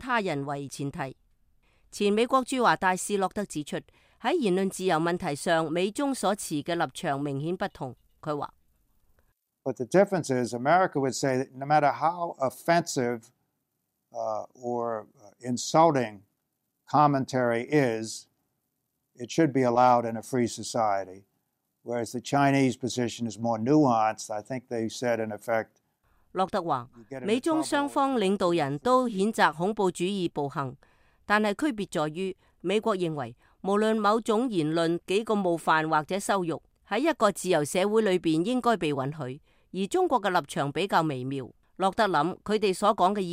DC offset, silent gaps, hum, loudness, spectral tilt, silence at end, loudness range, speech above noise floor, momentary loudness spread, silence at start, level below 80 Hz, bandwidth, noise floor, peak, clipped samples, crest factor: under 0.1%; none; none; -27 LUFS; -5 dB/octave; 0 s; 4 LU; 53 dB; 12 LU; 0 s; -64 dBFS; 16 kHz; -80 dBFS; -8 dBFS; under 0.1%; 20 dB